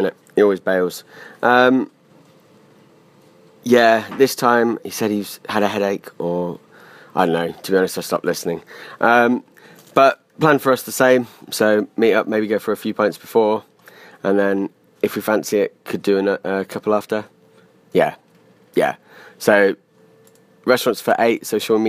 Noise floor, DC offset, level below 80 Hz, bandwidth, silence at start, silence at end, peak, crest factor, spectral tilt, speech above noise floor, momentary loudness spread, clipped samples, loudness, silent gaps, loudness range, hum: -52 dBFS; under 0.1%; -68 dBFS; 15.5 kHz; 0 s; 0 s; 0 dBFS; 18 dB; -4.5 dB/octave; 35 dB; 10 LU; under 0.1%; -18 LUFS; none; 4 LU; none